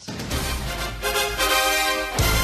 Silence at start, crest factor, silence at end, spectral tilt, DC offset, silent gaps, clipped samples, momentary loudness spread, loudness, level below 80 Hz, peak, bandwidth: 0 s; 18 dB; 0 s; -2.5 dB/octave; under 0.1%; none; under 0.1%; 9 LU; -22 LUFS; -32 dBFS; -4 dBFS; 14.5 kHz